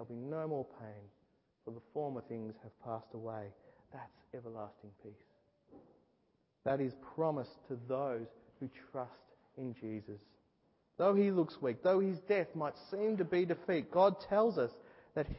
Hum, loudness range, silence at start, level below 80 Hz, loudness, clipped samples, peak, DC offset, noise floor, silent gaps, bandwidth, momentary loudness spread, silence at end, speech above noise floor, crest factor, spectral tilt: none; 15 LU; 0 s; -66 dBFS; -37 LUFS; under 0.1%; -18 dBFS; under 0.1%; -77 dBFS; none; 5.6 kHz; 22 LU; 0 s; 40 dB; 20 dB; -6.5 dB/octave